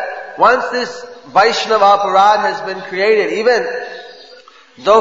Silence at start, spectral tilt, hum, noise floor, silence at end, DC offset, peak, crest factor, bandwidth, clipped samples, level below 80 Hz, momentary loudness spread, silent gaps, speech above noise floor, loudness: 0 s; -3 dB/octave; none; -42 dBFS; 0 s; 0.3%; 0 dBFS; 14 dB; 8 kHz; under 0.1%; -56 dBFS; 14 LU; none; 28 dB; -13 LUFS